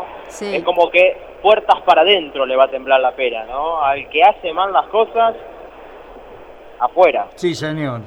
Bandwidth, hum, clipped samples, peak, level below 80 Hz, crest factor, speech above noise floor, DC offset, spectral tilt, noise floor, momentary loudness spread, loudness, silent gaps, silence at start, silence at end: 11 kHz; none; under 0.1%; 0 dBFS; -50 dBFS; 16 dB; 22 dB; under 0.1%; -4.5 dB/octave; -38 dBFS; 10 LU; -15 LUFS; none; 0 s; 0 s